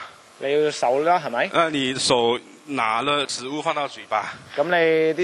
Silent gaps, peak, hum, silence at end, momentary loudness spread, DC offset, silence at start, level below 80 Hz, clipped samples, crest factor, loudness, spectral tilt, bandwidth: none; -2 dBFS; none; 0 s; 9 LU; under 0.1%; 0 s; -64 dBFS; under 0.1%; 20 dB; -22 LUFS; -3.5 dB/octave; 12 kHz